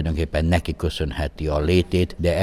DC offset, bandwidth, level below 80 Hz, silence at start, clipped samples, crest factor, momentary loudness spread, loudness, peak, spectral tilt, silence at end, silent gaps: under 0.1%; 14 kHz; -30 dBFS; 0 s; under 0.1%; 14 dB; 7 LU; -22 LUFS; -8 dBFS; -6.5 dB/octave; 0 s; none